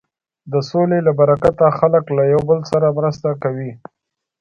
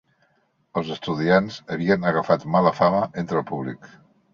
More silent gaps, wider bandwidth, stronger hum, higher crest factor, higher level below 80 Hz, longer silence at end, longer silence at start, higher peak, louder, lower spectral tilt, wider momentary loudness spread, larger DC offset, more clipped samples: neither; about the same, 7.6 kHz vs 7.4 kHz; neither; about the same, 16 dB vs 20 dB; first, -48 dBFS vs -58 dBFS; first, 0.65 s vs 0.5 s; second, 0.45 s vs 0.75 s; about the same, 0 dBFS vs -2 dBFS; first, -16 LUFS vs -22 LUFS; about the same, -8.5 dB/octave vs -7.5 dB/octave; second, 9 LU vs 12 LU; neither; neither